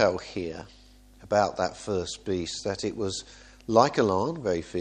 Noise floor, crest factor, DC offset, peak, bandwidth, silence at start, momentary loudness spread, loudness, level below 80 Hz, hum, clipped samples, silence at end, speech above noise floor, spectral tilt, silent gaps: -52 dBFS; 24 dB; under 0.1%; -4 dBFS; 10.5 kHz; 0 s; 14 LU; -28 LUFS; -54 dBFS; none; under 0.1%; 0 s; 25 dB; -5 dB/octave; none